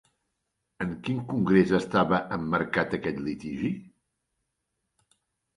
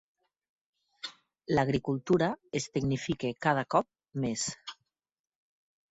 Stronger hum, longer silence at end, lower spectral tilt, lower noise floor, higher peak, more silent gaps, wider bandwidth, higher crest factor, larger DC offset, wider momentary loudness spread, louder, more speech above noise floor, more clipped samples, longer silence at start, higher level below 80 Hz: neither; first, 1.75 s vs 1.2 s; first, -7.5 dB/octave vs -5 dB/octave; about the same, -81 dBFS vs -83 dBFS; first, -8 dBFS vs -12 dBFS; neither; first, 11 kHz vs 8 kHz; about the same, 22 dB vs 22 dB; neither; second, 11 LU vs 15 LU; first, -27 LUFS vs -31 LUFS; about the same, 54 dB vs 54 dB; neither; second, 0.8 s vs 1.05 s; about the same, -56 dBFS vs -60 dBFS